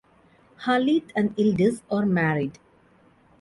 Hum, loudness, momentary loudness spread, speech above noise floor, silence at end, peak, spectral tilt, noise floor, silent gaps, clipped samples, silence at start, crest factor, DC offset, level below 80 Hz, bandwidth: none; -24 LUFS; 7 LU; 35 dB; 0.9 s; -10 dBFS; -7 dB/octave; -58 dBFS; none; under 0.1%; 0.6 s; 16 dB; under 0.1%; -60 dBFS; 11.5 kHz